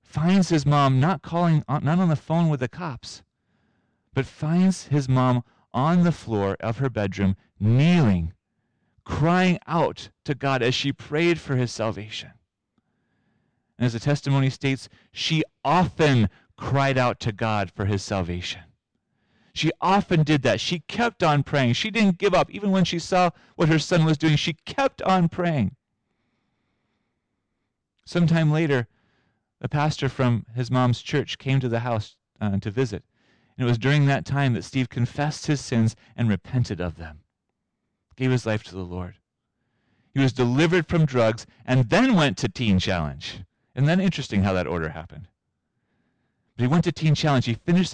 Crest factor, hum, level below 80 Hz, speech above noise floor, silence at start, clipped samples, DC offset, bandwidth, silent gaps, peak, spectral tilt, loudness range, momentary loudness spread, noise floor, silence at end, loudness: 10 dB; none; -50 dBFS; 57 dB; 0.15 s; under 0.1%; under 0.1%; 9.8 kHz; none; -14 dBFS; -6.5 dB/octave; 6 LU; 11 LU; -79 dBFS; 0 s; -23 LUFS